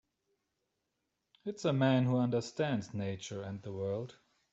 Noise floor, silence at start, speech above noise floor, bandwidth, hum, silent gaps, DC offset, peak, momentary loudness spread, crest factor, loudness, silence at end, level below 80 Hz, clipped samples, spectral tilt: -85 dBFS; 1.45 s; 51 dB; 8 kHz; none; none; under 0.1%; -16 dBFS; 14 LU; 20 dB; -34 LUFS; 0.4 s; -74 dBFS; under 0.1%; -6.5 dB/octave